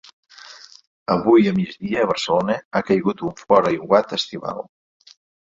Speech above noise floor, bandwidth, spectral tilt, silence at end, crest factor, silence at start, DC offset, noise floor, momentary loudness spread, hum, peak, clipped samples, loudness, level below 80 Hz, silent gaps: 24 dB; 7.8 kHz; -6 dB/octave; 0.8 s; 18 dB; 0.45 s; under 0.1%; -43 dBFS; 18 LU; none; -2 dBFS; under 0.1%; -20 LUFS; -56 dBFS; 0.87-1.06 s, 2.65-2.71 s